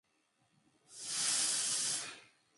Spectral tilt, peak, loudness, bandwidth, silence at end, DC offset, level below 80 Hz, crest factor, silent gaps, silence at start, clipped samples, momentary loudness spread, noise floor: 1.5 dB/octave; -22 dBFS; -33 LUFS; 12 kHz; 0.35 s; under 0.1%; -86 dBFS; 18 dB; none; 0.9 s; under 0.1%; 14 LU; -77 dBFS